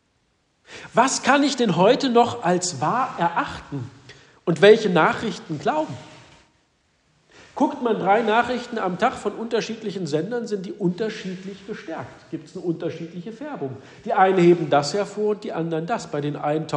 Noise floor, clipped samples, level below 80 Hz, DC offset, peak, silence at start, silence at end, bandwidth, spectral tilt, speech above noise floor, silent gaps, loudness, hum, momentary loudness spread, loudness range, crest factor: -67 dBFS; under 0.1%; -62 dBFS; under 0.1%; -2 dBFS; 0.7 s; 0 s; 10.5 kHz; -5 dB/octave; 45 dB; none; -22 LUFS; none; 17 LU; 8 LU; 20 dB